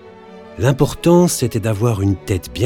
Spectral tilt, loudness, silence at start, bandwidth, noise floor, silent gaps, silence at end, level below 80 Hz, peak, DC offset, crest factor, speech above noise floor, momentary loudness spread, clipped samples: -6 dB/octave; -16 LUFS; 0.05 s; 17.5 kHz; -38 dBFS; none; 0 s; -40 dBFS; 0 dBFS; under 0.1%; 16 dB; 23 dB; 8 LU; under 0.1%